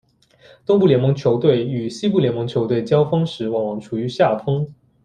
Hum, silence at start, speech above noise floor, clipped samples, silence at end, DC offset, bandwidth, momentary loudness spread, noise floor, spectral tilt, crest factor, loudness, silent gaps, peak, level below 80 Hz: none; 0.7 s; 33 dB; under 0.1%; 0.3 s; under 0.1%; 9.4 kHz; 9 LU; -51 dBFS; -8 dB/octave; 16 dB; -19 LUFS; none; -2 dBFS; -56 dBFS